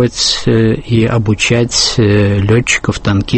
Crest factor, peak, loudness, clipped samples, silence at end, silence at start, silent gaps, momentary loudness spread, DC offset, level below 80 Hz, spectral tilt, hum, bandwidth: 12 dB; 0 dBFS; -11 LUFS; under 0.1%; 0 s; 0 s; none; 3 LU; under 0.1%; -32 dBFS; -4.5 dB/octave; none; 8.8 kHz